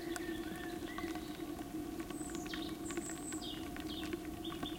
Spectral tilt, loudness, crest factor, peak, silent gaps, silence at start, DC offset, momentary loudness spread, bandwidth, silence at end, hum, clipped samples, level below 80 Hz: -4 dB/octave; -43 LUFS; 20 dB; -22 dBFS; none; 0 s; under 0.1%; 2 LU; 17 kHz; 0 s; none; under 0.1%; -58 dBFS